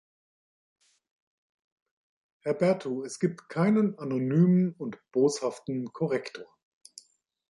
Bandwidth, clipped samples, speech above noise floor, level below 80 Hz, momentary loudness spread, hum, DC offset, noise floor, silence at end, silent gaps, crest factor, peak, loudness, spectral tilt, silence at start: 11.5 kHz; under 0.1%; 33 dB; -76 dBFS; 12 LU; none; under 0.1%; -60 dBFS; 1.1 s; none; 18 dB; -12 dBFS; -28 LUFS; -7 dB/octave; 2.45 s